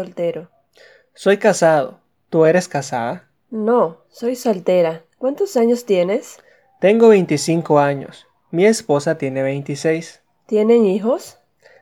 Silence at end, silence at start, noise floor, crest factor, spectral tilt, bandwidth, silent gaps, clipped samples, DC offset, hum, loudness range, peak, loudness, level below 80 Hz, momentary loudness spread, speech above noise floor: 0.5 s; 0 s; -50 dBFS; 18 dB; -5.5 dB/octave; 15 kHz; none; under 0.1%; under 0.1%; none; 3 LU; 0 dBFS; -17 LUFS; -72 dBFS; 11 LU; 34 dB